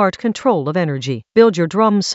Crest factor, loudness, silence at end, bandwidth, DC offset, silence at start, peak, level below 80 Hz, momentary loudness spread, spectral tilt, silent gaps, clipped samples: 16 dB; -16 LUFS; 0 s; 8.2 kHz; under 0.1%; 0 s; 0 dBFS; -60 dBFS; 6 LU; -5.5 dB/octave; none; under 0.1%